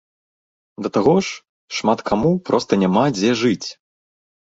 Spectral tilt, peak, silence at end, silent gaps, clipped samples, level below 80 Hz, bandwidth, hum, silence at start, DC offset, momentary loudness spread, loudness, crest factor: -5.5 dB/octave; -2 dBFS; 0.75 s; 1.49-1.68 s; under 0.1%; -52 dBFS; 8 kHz; none; 0.8 s; under 0.1%; 12 LU; -19 LUFS; 18 dB